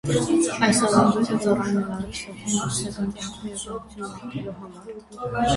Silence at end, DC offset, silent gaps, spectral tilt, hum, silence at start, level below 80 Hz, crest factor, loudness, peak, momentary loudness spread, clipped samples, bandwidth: 0 s; under 0.1%; none; -4.5 dB/octave; none; 0.05 s; -48 dBFS; 18 dB; -24 LUFS; -6 dBFS; 17 LU; under 0.1%; 11.5 kHz